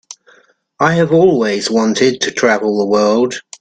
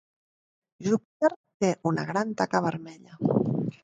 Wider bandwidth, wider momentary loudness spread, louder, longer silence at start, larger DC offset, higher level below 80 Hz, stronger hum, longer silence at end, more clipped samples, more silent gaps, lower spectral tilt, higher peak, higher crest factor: about the same, 9.4 kHz vs 9.2 kHz; about the same, 5 LU vs 6 LU; first, -13 LUFS vs -28 LUFS; second, 0.1 s vs 0.8 s; neither; first, -56 dBFS vs -66 dBFS; neither; about the same, 0.2 s vs 0.1 s; neither; second, none vs 1.05-1.20 s, 1.36-1.44 s, 1.54-1.60 s; second, -5 dB/octave vs -6.5 dB/octave; first, 0 dBFS vs -8 dBFS; second, 14 dB vs 20 dB